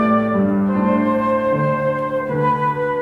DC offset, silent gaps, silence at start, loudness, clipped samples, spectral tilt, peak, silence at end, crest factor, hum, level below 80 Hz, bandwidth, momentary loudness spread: under 0.1%; none; 0 s; -18 LUFS; under 0.1%; -9.5 dB/octave; -4 dBFS; 0 s; 12 dB; none; -52 dBFS; 5 kHz; 3 LU